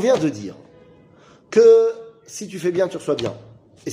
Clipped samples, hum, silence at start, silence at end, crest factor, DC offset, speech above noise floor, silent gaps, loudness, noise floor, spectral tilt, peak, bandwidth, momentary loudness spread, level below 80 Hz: under 0.1%; none; 0 s; 0 s; 16 dB; under 0.1%; 32 dB; none; -18 LUFS; -50 dBFS; -5.5 dB/octave; -4 dBFS; 11.5 kHz; 23 LU; -62 dBFS